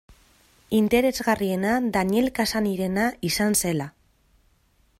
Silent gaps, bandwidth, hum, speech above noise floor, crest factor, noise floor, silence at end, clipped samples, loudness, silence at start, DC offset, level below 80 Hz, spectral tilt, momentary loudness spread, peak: none; 16 kHz; none; 40 dB; 16 dB; -63 dBFS; 1.1 s; under 0.1%; -23 LUFS; 0.7 s; under 0.1%; -50 dBFS; -4.5 dB/octave; 5 LU; -8 dBFS